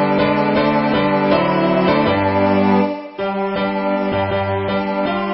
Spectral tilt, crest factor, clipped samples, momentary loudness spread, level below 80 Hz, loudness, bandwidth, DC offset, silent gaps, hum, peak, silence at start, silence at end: -11.5 dB/octave; 14 dB; under 0.1%; 5 LU; -42 dBFS; -17 LUFS; 5.8 kHz; under 0.1%; none; none; -2 dBFS; 0 s; 0 s